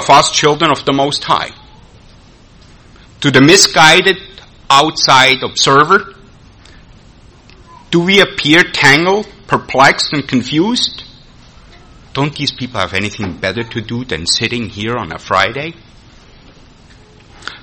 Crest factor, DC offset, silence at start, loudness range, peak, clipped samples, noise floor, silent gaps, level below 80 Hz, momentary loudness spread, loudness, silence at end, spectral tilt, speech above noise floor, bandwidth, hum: 14 dB; under 0.1%; 0 s; 9 LU; 0 dBFS; 0.5%; -41 dBFS; none; -42 dBFS; 14 LU; -11 LUFS; 0.05 s; -3 dB/octave; 30 dB; over 20 kHz; none